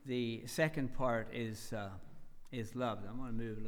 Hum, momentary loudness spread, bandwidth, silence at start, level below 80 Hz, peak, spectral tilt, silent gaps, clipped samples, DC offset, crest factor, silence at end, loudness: none; 10 LU; 19 kHz; 0 s; -52 dBFS; -20 dBFS; -5.5 dB/octave; none; under 0.1%; under 0.1%; 18 dB; 0 s; -40 LUFS